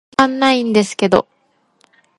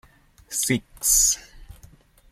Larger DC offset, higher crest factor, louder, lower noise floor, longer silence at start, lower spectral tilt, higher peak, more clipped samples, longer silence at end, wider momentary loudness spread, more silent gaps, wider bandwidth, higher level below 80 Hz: neither; about the same, 16 dB vs 20 dB; first, -15 LUFS vs -20 LUFS; first, -58 dBFS vs -52 dBFS; second, 0.2 s vs 0.5 s; first, -4.5 dB/octave vs -1.5 dB/octave; first, 0 dBFS vs -6 dBFS; neither; first, 1 s vs 0.6 s; second, 4 LU vs 12 LU; neither; second, 11.5 kHz vs 16.5 kHz; second, -54 dBFS vs -44 dBFS